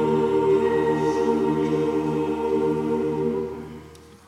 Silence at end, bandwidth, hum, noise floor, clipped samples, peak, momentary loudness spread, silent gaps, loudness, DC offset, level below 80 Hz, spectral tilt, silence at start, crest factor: 0.25 s; 11 kHz; none; -45 dBFS; under 0.1%; -10 dBFS; 10 LU; none; -23 LUFS; under 0.1%; -52 dBFS; -7.5 dB/octave; 0 s; 14 dB